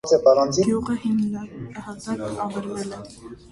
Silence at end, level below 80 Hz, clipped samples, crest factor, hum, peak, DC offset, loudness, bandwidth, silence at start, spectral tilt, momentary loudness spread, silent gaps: 0.15 s; -52 dBFS; under 0.1%; 18 dB; none; -4 dBFS; under 0.1%; -22 LUFS; 11.5 kHz; 0.05 s; -5.5 dB/octave; 19 LU; none